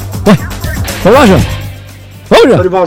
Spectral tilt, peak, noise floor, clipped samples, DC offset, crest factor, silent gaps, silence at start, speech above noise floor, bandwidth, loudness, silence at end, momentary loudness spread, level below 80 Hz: -6 dB/octave; 0 dBFS; -29 dBFS; 2%; under 0.1%; 8 dB; none; 0 s; 24 dB; 17.5 kHz; -8 LUFS; 0 s; 15 LU; -24 dBFS